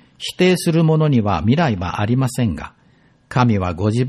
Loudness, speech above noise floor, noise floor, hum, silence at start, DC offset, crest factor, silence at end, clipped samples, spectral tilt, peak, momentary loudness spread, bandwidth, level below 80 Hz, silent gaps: -17 LUFS; 37 dB; -54 dBFS; none; 0.2 s; under 0.1%; 14 dB; 0 s; under 0.1%; -6.5 dB/octave; -2 dBFS; 8 LU; 13 kHz; -42 dBFS; none